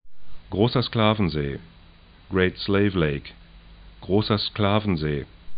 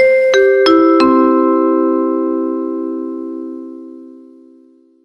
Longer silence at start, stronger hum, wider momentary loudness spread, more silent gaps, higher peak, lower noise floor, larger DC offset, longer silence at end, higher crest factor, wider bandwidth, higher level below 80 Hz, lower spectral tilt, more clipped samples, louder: about the same, 0.05 s vs 0 s; neither; second, 11 LU vs 18 LU; neither; second, -6 dBFS vs 0 dBFS; about the same, -50 dBFS vs -47 dBFS; neither; second, 0 s vs 0.9 s; first, 18 dB vs 12 dB; second, 5.2 kHz vs 6.6 kHz; first, -44 dBFS vs -58 dBFS; first, -11 dB/octave vs -4 dB/octave; neither; second, -24 LUFS vs -12 LUFS